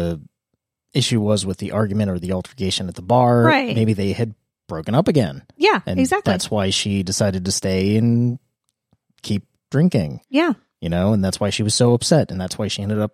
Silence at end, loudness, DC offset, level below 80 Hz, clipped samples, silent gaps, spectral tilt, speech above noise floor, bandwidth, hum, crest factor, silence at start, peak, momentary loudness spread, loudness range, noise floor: 0.05 s; -19 LUFS; under 0.1%; -50 dBFS; under 0.1%; none; -5.5 dB/octave; 58 dB; 15 kHz; none; 18 dB; 0 s; -2 dBFS; 10 LU; 3 LU; -76 dBFS